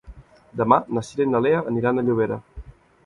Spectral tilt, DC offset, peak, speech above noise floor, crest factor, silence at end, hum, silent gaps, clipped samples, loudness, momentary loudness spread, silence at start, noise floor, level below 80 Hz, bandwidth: -7.5 dB/octave; under 0.1%; -2 dBFS; 24 dB; 22 dB; 0.35 s; none; none; under 0.1%; -21 LUFS; 8 LU; 0.05 s; -45 dBFS; -48 dBFS; 11 kHz